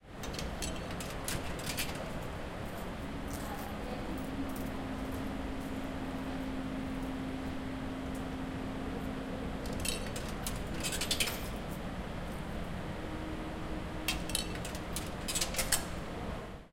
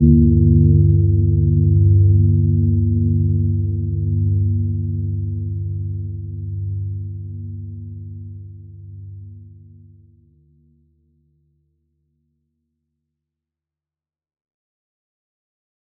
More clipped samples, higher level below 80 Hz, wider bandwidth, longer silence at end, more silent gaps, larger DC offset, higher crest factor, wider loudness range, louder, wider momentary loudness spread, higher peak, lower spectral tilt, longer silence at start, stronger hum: neither; second, -46 dBFS vs -32 dBFS; first, 17 kHz vs 0.6 kHz; second, 0.05 s vs 6.45 s; neither; neither; first, 26 dB vs 18 dB; second, 4 LU vs 21 LU; second, -38 LUFS vs -17 LUFS; second, 8 LU vs 23 LU; second, -12 dBFS vs -2 dBFS; second, -3.5 dB/octave vs -20.5 dB/octave; about the same, 0 s vs 0 s; neither